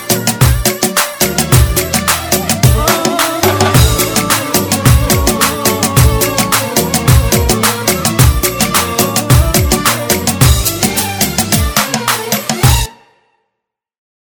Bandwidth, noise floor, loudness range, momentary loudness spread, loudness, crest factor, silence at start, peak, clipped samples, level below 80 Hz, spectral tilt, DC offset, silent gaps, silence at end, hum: over 20 kHz; -76 dBFS; 2 LU; 3 LU; -11 LUFS; 12 dB; 0 s; 0 dBFS; 0.3%; -20 dBFS; -4 dB/octave; under 0.1%; none; 1.35 s; none